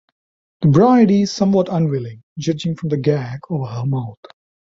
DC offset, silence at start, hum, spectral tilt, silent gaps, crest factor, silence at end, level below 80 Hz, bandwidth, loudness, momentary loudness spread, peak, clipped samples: under 0.1%; 0.6 s; none; -7.5 dB/octave; 2.23-2.36 s; 16 dB; 0.55 s; -54 dBFS; 7.8 kHz; -17 LUFS; 13 LU; -2 dBFS; under 0.1%